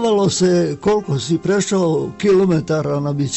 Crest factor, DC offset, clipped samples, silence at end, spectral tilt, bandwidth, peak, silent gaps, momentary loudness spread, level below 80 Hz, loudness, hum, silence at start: 10 dB; under 0.1%; under 0.1%; 0 s; -5.5 dB/octave; 8.4 kHz; -6 dBFS; none; 5 LU; -50 dBFS; -17 LUFS; none; 0 s